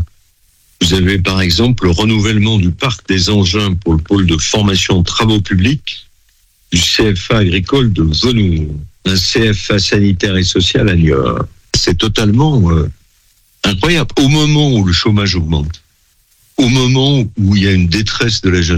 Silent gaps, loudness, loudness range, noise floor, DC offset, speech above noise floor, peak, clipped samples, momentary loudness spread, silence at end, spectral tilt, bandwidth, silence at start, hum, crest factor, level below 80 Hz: none; -12 LUFS; 1 LU; -54 dBFS; under 0.1%; 42 dB; 0 dBFS; under 0.1%; 6 LU; 0 s; -5 dB/octave; 14.5 kHz; 0 s; none; 12 dB; -26 dBFS